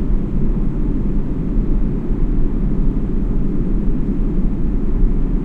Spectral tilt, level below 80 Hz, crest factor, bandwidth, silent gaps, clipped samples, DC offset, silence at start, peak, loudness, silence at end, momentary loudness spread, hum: -11 dB/octave; -16 dBFS; 12 dB; 2.6 kHz; none; under 0.1%; under 0.1%; 0 s; -2 dBFS; -21 LUFS; 0 s; 1 LU; none